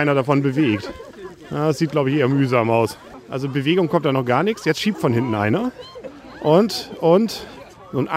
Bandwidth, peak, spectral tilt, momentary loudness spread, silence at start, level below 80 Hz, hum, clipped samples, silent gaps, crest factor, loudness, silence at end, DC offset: 16 kHz; -2 dBFS; -6.5 dB/octave; 19 LU; 0 s; -56 dBFS; none; under 0.1%; none; 18 dB; -19 LUFS; 0 s; under 0.1%